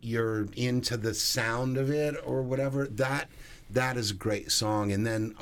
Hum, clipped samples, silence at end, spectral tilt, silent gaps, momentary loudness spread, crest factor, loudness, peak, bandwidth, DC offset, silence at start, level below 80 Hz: none; under 0.1%; 0 s; -4.5 dB/octave; none; 4 LU; 16 dB; -29 LUFS; -12 dBFS; 19 kHz; under 0.1%; 0 s; -52 dBFS